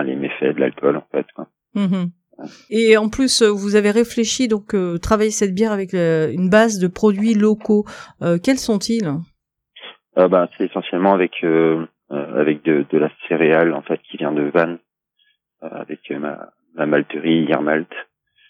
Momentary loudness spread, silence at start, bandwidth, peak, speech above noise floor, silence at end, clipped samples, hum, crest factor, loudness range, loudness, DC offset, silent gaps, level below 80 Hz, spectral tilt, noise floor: 17 LU; 0 s; 14.5 kHz; 0 dBFS; 47 dB; 0.45 s; under 0.1%; none; 18 dB; 5 LU; -18 LUFS; under 0.1%; none; -48 dBFS; -5 dB/octave; -64 dBFS